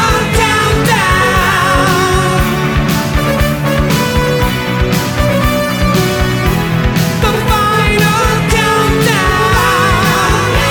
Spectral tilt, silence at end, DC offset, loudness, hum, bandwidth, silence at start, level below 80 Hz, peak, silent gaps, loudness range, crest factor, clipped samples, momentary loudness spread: -4.5 dB/octave; 0 s; under 0.1%; -11 LUFS; none; 19.5 kHz; 0 s; -20 dBFS; 0 dBFS; none; 2 LU; 10 dB; under 0.1%; 3 LU